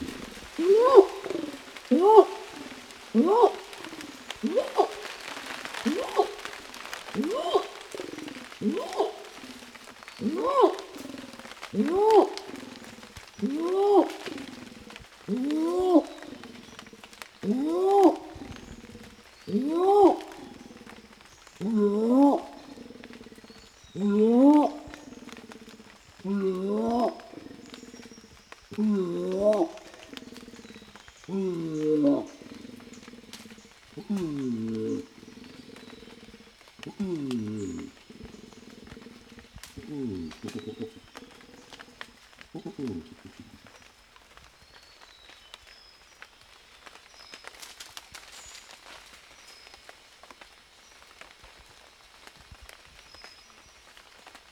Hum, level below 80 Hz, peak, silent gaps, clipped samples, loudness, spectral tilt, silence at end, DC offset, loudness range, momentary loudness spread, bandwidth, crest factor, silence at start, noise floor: none; -62 dBFS; -2 dBFS; none; under 0.1%; -26 LUFS; -6 dB/octave; 0.15 s; under 0.1%; 21 LU; 26 LU; 15 kHz; 28 dB; 0 s; -56 dBFS